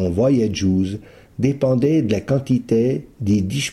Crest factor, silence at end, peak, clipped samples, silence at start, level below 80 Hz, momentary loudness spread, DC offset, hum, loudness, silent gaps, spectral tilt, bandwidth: 14 dB; 0 s; -6 dBFS; under 0.1%; 0 s; -46 dBFS; 7 LU; under 0.1%; none; -19 LUFS; none; -7 dB/octave; 14.5 kHz